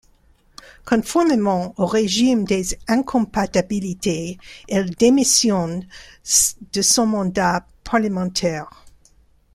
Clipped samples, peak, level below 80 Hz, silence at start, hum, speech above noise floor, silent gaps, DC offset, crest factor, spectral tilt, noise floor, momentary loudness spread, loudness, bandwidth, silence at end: under 0.1%; -2 dBFS; -46 dBFS; 0.85 s; none; 36 dB; none; under 0.1%; 18 dB; -3.5 dB/octave; -55 dBFS; 12 LU; -19 LUFS; 15.5 kHz; 0.65 s